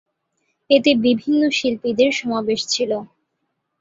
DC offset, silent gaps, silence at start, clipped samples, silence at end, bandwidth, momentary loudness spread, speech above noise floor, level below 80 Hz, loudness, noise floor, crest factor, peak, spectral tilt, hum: under 0.1%; none; 0.7 s; under 0.1%; 0.75 s; 8 kHz; 6 LU; 56 dB; -62 dBFS; -18 LUFS; -74 dBFS; 18 dB; -2 dBFS; -3.5 dB/octave; none